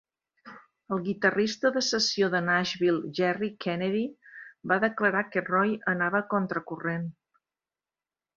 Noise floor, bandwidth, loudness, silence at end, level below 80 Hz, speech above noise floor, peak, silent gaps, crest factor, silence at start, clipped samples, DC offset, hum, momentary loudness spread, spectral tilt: under -90 dBFS; 7.6 kHz; -27 LUFS; 1.25 s; -70 dBFS; over 63 dB; -8 dBFS; none; 20 dB; 0.45 s; under 0.1%; under 0.1%; none; 9 LU; -4.5 dB/octave